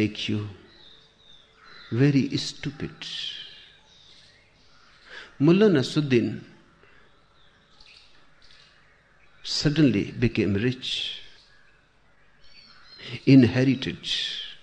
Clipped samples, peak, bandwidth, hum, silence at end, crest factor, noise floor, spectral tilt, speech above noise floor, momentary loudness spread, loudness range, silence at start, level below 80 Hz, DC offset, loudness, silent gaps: under 0.1%; -6 dBFS; 9.6 kHz; none; 0.05 s; 20 dB; -61 dBFS; -6 dB/octave; 38 dB; 21 LU; 7 LU; 0 s; -54 dBFS; under 0.1%; -24 LUFS; none